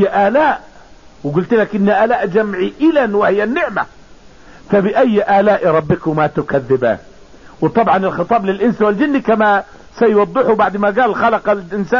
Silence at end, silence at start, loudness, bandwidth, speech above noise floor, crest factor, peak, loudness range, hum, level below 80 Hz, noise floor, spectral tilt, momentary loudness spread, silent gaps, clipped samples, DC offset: 0 s; 0 s; -14 LUFS; 7.2 kHz; 28 dB; 12 dB; -2 dBFS; 2 LU; none; -46 dBFS; -42 dBFS; -8 dB/octave; 6 LU; none; under 0.1%; 0.5%